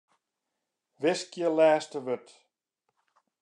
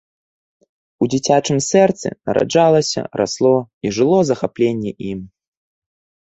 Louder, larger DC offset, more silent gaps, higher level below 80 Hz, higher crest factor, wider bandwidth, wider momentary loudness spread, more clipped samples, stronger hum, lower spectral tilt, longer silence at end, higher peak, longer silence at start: second, -28 LUFS vs -17 LUFS; neither; second, none vs 3.73-3.81 s; second, under -90 dBFS vs -54 dBFS; about the same, 20 dB vs 18 dB; first, 10.5 kHz vs 8.2 kHz; about the same, 12 LU vs 11 LU; neither; neither; about the same, -4.5 dB/octave vs -5 dB/octave; first, 1.25 s vs 1 s; second, -12 dBFS vs 0 dBFS; about the same, 1 s vs 1 s